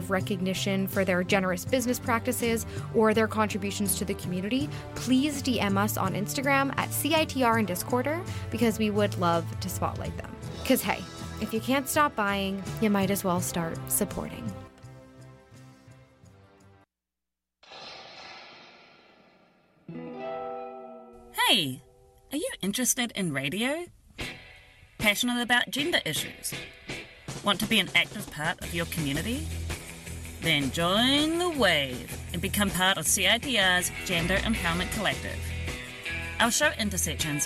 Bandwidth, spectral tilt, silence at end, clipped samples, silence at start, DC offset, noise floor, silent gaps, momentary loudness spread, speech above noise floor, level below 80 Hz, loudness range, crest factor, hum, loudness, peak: 16.5 kHz; -3.5 dB/octave; 0 s; under 0.1%; 0 s; under 0.1%; -89 dBFS; none; 16 LU; 61 dB; -48 dBFS; 11 LU; 18 dB; none; -27 LUFS; -10 dBFS